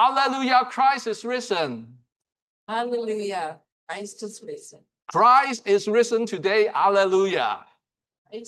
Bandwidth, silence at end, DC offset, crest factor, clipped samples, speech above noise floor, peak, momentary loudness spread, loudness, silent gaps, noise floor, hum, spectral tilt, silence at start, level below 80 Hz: 12.5 kHz; 0.05 s; under 0.1%; 16 dB; under 0.1%; 46 dB; -6 dBFS; 17 LU; -22 LUFS; 2.12-2.20 s, 2.42-2.67 s, 3.72-3.87 s, 8.18-8.25 s; -69 dBFS; none; -3.5 dB/octave; 0 s; -78 dBFS